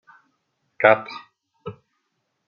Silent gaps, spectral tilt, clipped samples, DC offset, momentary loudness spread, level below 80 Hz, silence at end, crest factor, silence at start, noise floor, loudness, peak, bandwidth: none; -2.5 dB/octave; under 0.1%; under 0.1%; 22 LU; -72 dBFS; 0.75 s; 24 dB; 0.8 s; -75 dBFS; -19 LUFS; -2 dBFS; 6.4 kHz